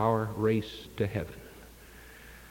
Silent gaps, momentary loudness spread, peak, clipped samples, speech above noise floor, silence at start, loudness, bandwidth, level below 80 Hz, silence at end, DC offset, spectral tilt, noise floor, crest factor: none; 22 LU; -12 dBFS; under 0.1%; 21 dB; 0 s; -32 LUFS; 17 kHz; -54 dBFS; 0 s; under 0.1%; -7 dB/octave; -51 dBFS; 20 dB